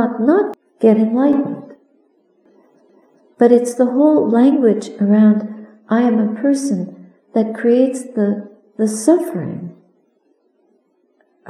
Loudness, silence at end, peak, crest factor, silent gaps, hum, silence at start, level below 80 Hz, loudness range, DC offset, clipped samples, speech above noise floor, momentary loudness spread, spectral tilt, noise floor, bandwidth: -15 LUFS; 1.75 s; 0 dBFS; 16 dB; none; none; 0 s; -74 dBFS; 5 LU; under 0.1%; under 0.1%; 46 dB; 14 LU; -7 dB/octave; -61 dBFS; 12.5 kHz